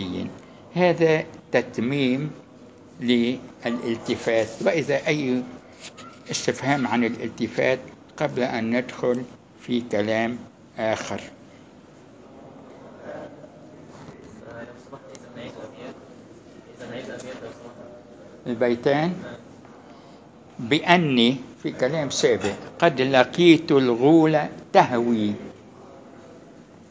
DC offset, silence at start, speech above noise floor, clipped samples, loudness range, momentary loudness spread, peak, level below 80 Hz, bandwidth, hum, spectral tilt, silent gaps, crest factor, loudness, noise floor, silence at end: under 0.1%; 0 s; 26 dB; under 0.1%; 21 LU; 24 LU; 0 dBFS; -60 dBFS; 8 kHz; none; -5.5 dB/octave; none; 24 dB; -22 LUFS; -48 dBFS; 0.05 s